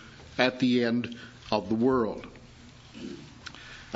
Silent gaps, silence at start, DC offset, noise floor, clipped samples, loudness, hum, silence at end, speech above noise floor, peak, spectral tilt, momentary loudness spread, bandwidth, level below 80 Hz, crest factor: none; 0 s; under 0.1%; -50 dBFS; under 0.1%; -27 LUFS; none; 0 s; 23 dB; -6 dBFS; -6 dB/octave; 19 LU; 8 kHz; -58 dBFS; 24 dB